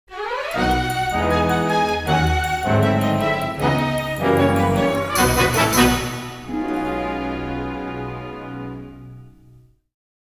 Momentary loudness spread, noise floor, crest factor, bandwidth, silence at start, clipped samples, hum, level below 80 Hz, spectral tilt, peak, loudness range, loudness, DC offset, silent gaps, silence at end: 14 LU; -50 dBFS; 18 dB; 16 kHz; 0.1 s; under 0.1%; none; -34 dBFS; -5 dB/octave; -2 dBFS; 9 LU; -20 LUFS; under 0.1%; none; 0.95 s